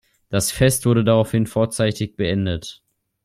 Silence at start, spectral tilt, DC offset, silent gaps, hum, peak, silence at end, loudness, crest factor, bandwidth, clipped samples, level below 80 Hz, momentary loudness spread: 0.3 s; -5.5 dB/octave; under 0.1%; none; none; -2 dBFS; 0.5 s; -20 LUFS; 18 dB; 16 kHz; under 0.1%; -44 dBFS; 9 LU